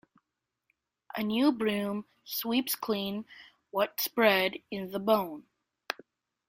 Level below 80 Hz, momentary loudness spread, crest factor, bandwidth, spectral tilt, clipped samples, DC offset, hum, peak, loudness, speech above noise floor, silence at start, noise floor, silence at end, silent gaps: -72 dBFS; 15 LU; 24 dB; 16.5 kHz; -4 dB/octave; under 0.1%; under 0.1%; none; -8 dBFS; -30 LUFS; 56 dB; 1.15 s; -85 dBFS; 0.55 s; none